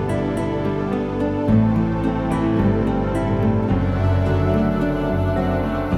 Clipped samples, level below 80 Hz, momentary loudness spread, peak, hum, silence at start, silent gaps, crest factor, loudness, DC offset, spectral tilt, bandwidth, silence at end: under 0.1%; -32 dBFS; 4 LU; -6 dBFS; none; 0 s; none; 12 dB; -20 LUFS; under 0.1%; -9 dB/octave; 11.5 kHz; 0 s